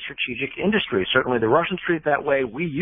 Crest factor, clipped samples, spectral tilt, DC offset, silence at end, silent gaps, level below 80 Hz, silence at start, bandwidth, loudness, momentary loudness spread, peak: 18 dB; under 0.1%; -10.5 dB/octave; under 0.1%; 0 s; none; -52 dBFS; 0 s; 3.8 kHz; -22 LUFS; 6 LU; -4 dBFS